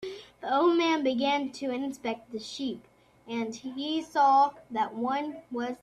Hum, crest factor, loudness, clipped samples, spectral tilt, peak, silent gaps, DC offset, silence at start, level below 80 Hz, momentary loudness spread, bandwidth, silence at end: none; 16 dB; -29 LUFS; under 0.1%; -4 dB/octave; -14 dBFS; none; under 0.1%; 0 s; -72 dBFS; 14 LU; 12 kHz; 0.05 s